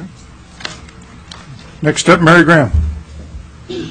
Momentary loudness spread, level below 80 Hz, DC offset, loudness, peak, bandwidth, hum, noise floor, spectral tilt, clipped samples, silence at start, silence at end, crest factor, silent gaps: 27 LU; -26 dBFS; under 0.1%; -10 LUFS; 0 dBFS; 10.5 kHz; none; -37 dBFS; -5.5 dB/octave; under 0.1%; 0 s; 0 s; 14 dB; none